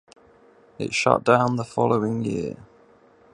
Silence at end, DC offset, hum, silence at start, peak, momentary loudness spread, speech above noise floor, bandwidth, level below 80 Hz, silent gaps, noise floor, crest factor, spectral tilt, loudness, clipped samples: 0.8 s; under 0.1%; none; 0.8 s; -2 dBFS; 15 LU; 33 dB; 11 kHz; -58 dBFS; none; -55 dBFS; 24 dB; -5.5 dB/octave; -22 LUFS; under 0.1%